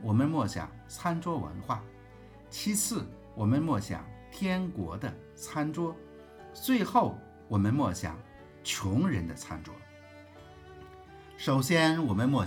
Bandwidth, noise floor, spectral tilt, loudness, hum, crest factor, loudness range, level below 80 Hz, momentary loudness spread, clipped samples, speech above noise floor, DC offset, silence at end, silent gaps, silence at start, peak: over 20 kHz; -52 dBFS; -5.5 dB/octave; -31 LUFS; none; 20 dB; 4 LU; -58 dBFS; 24 LU; under 0.1%; 22 dB; under 0.1%; 0 s; none; 0 s; -10 dBFS